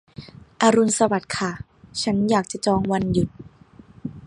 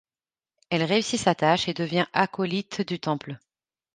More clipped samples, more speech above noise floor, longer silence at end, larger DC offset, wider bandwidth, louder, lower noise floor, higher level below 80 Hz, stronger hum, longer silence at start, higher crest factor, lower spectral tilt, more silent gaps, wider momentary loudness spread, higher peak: neither; second, 28 dB vs over 65 dB; second, 0.05 s vs 0.6 s; neither; first, 11.5 kHz vs 9.8 kHz; first, -21 LUFS vs -25 LUFS; second, -49 dBFS vs under -90 dBFS; first, -48 dBFS vs -64 dBFS; neither; second, 0.2 s vs 0.7 s; about the same, 20 dB vs 24 dB; about the same, -5 dB/octave vs -4.5 dB/octave; neither; first, 19 LU vs 8 LU; about the same, -2 dBFS vs -4 dBFS